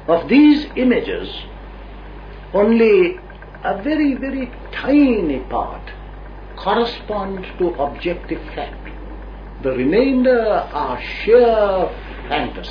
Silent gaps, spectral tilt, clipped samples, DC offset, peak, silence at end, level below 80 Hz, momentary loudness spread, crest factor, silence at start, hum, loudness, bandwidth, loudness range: none; -8 dB/octave; under 0.1%; under 0.1%; -2 dBFS; 0 s; -36 dBFS; 23 LU; 16 dB; 0 s; 50 Hz at -35 dBFS; -17 LUFS; 5.2 kHz; 7 LU